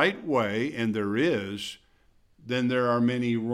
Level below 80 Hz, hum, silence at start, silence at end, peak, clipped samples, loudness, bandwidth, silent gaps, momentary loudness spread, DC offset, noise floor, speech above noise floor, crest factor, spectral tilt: -66 dBFS; none; 0 s; 0 s; -6 dBFS; under 0.1%; -27 LUFS; 13 kHz; none; 10 LU; under 0.1%; -62 dBFS; 36 dB; 20 dB; -6 dB/octave